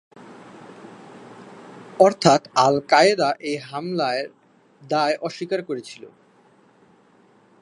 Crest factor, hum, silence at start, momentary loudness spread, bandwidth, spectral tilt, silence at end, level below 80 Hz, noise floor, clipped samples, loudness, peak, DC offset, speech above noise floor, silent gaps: 22 dB; none; 0.25 s; 27 LU; 11.5 kHz; -4.5 dB/octave; 1.55 s; -70 dBFS; -56 dBFS; under 0.1%; -20 LUFS; 0 dBFS; under 0.1%; 36 dB; none